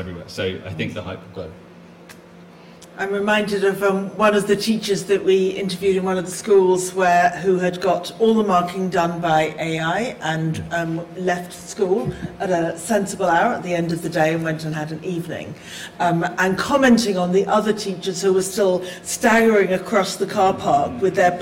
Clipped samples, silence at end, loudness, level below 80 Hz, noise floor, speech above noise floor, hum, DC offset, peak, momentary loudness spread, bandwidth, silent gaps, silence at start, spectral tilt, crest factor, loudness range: under 0.1%; 0 s; -20 LUFS; -54 dBFS; -43 dBFS; 24 dB; none; under 0.1%; -4 dBFS; 11 LU; 16.5 kHz; none; 0 s; -5 dB/octave; 16 dB; 5 LU